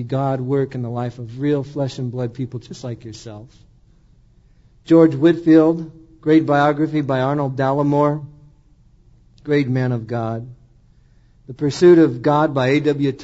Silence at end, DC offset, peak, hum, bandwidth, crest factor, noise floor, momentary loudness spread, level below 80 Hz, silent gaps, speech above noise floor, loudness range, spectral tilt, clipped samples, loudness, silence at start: 0 s; under 0.1%; -2 dBFS; none; 8 kHz; 18 dB; -52 dBFS; 18 LU; -52 dBFS; none; 34 dB; 10 LU; -8 dB/octave; under 0.1%; -18 LUFS; 0 s